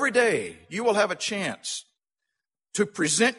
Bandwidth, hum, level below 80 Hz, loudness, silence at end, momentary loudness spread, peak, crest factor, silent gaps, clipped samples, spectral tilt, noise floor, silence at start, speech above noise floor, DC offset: 11.5 kHz; none; -70 dBFS; -26 LUFS; 0 s; 12 LU; -8 dBFS; 18 dB; none; under 0.1%; -2.5 dB/octave; -85 dBFS; 0 s; 60 dB; under 0.1%